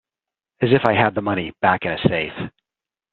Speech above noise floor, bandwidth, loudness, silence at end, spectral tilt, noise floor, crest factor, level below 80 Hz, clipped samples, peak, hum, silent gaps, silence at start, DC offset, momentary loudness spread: 70 dB; 5.4 kHz; -19 LUFS; 0.65 s; -4.5 dB/octave; -89 dBFS; 20 dB; -52 dBFS; under 0.1%; 0 dBFS; none; none; 0.6 s; under 0.1%; 11 LU